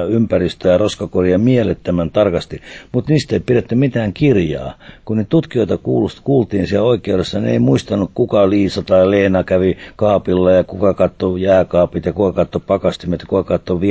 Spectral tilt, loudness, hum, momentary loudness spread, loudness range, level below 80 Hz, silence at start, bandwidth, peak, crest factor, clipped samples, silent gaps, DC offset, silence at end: -7.5 dB/octave; -15 LUFS; none; 6 LU; 3 LU; -36 dBFS; 0 s; 8 kHz; -2 dBFS; 14 dB; under 0.1%; none; under 0.1%; 0 s